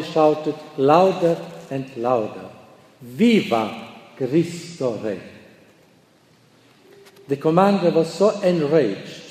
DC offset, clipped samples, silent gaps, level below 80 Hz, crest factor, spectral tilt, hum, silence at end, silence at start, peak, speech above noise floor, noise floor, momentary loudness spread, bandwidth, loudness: under 0.1%; under 0.1%; none; -68 dBFS; 20 dB; -6.5 dB/octave; none; 0 s; 0 s; -2 dBFS; 36 dB; -55 dBFS; 15 LU; 14.5 kHz; -20 LUFS